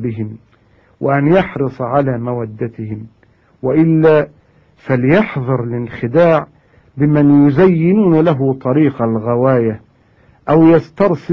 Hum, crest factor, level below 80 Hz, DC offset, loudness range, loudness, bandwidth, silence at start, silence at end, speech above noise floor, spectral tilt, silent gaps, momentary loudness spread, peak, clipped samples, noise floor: none; 14 dB; -46 dBFS; under 0.1%; 5 LU; -13 LUFS; 6 kHz; 0 s; 0 s; 37 dB; -10.5 dB/octave; none; 15 LU; 0 dBFS; under 0.1%; -50 dBFS